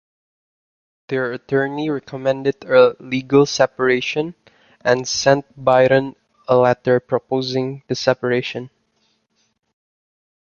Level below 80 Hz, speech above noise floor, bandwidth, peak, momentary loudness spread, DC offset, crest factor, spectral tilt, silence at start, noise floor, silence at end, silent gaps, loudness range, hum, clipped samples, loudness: -58 dBFS; 48 dB; 7.2 kHz; -2 dBFS; 11 LU; under 0.1%; 18 dB; -5 dB/octave; 1.1 s; -66 dBFS; 1.9 s; none; 5 LU; none; under 0.1%; -18 LUFS